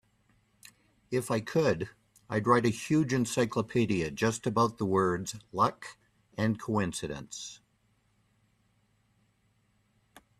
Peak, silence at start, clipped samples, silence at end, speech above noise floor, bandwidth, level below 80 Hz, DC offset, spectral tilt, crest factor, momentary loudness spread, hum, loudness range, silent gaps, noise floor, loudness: -10 dBFS; 1.1 s; under 0.1%; 2.85 s; 42 dB; 14.5 kHz; -62 dBFS; under 0.1%; -5.5 dB/octave; 22 dB; 14 LU; none; 10 LU; none; -71 dBFS; -30 LUFS